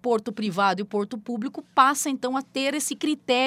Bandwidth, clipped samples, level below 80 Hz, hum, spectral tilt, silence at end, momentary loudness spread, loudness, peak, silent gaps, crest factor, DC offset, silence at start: 16 kHz; under 0.1%; -74 dBFS; none; -3 dB/octave; 0 s; 11 LU; -25 LUFS; -4 dBFS; none; 20 dB; under 0.1%; 0.05 s